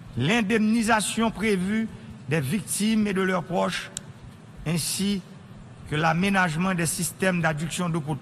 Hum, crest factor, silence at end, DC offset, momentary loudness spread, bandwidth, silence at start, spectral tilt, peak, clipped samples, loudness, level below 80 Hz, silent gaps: none; 18 dB; 0 s; under 0.1%; 14 LU; 14 kHz; 0 s; -4.5 dB/octave; -8 dBFS; under 0.1%; -25 LUFS; -52 dBFS; none